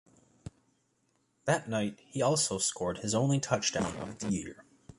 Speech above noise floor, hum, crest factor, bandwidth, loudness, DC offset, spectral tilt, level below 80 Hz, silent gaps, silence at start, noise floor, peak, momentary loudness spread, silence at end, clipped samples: 43 dB; none; 22 dB; 11.5 kHz; -31 LUFS; under 0.1%; -4 dB/octave; -60 dBFS; none; 0.45 s; -74 dBFS; -12 dBFS; 20 LU; 0.05 s; under 0.1%